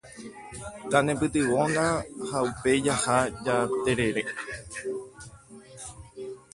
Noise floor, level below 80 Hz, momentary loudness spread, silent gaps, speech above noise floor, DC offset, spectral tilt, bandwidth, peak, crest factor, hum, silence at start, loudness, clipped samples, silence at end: -49 dBFS; -52 dBFS; 18 LU; none; 22 dB; under 0.1%; -4.5 dB/octave; 11.5 kHz; -6 dBFS; 22 dB; none; 0.05 s; -26 LUFS; under 0.1%; 0.15 s